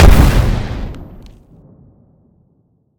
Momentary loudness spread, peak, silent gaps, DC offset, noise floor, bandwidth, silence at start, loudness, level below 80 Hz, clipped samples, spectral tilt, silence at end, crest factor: 24 LU; 0 dBFS; none; under 0.1%; -58 dBFS; 20 kHz; 0 s; -14 LUFS; -16 dBFS; 1%; -6.5 dB/octave; 1.95 s; 14 dB